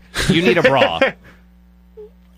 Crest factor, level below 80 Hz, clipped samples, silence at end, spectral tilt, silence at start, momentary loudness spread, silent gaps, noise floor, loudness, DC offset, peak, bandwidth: 16 dB; -38 dBFS; under 0.1%; 0.3 s; -5 dB/octave; 0.15 s; 6 LU; none; -48 dBFS; -15 LUFS; under 0.1%; -2 dBFS; 15.5 kHz